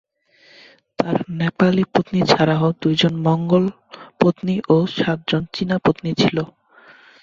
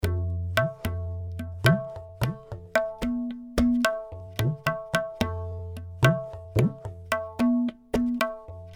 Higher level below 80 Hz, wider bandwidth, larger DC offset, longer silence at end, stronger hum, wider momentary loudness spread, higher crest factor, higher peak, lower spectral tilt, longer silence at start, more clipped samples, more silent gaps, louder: second, -54 dBFS vs -42 dBFS; second, 7.4 kHz vs over 20 kHz; neither; first, 0.75 s vs 0 s; neither; second, 7 LU vs 12 LU; second, 18 dB vs 24 dB; first, 0 dBFS vs -4 dBFS; about the same, -7 dB/octave vs -6.5 dB/octave; first, 1 s vs 0 s; neither; neither; first, -19 LUFS vs -28 LUFS